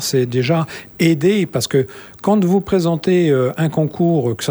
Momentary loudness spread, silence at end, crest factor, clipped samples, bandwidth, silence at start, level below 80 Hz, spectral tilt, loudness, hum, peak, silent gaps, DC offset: 5 LU; 0 s; 14 dB; under 0.1%; over 20 kHz; 0 s; -50 dBFS; -6 dB/octave; -17 LUFS; none; -2 dBFS; none; under 0.1%